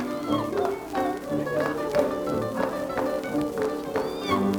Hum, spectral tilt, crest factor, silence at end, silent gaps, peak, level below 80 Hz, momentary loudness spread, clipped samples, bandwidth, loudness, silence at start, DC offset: none; -6 dB/octave; 18 dB; 0 s; none; -8 dBFS; -54 dBFS; 3 LU; under 0.1%; over 20 kHz; -27 LUFS; 0 s; under 0.1%